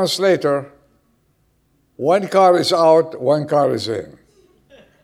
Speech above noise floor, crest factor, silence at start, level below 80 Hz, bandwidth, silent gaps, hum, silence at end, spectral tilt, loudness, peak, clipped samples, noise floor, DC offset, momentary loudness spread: 46 dB; 18 dB; 0 s; -64 dBFS; 15.5 kHz; none; none; 1 s; -5 dB/octave; -16 LUFS; 0 dBFS; under 0.1%; -62 dBFS; under 0.1%; 11 LU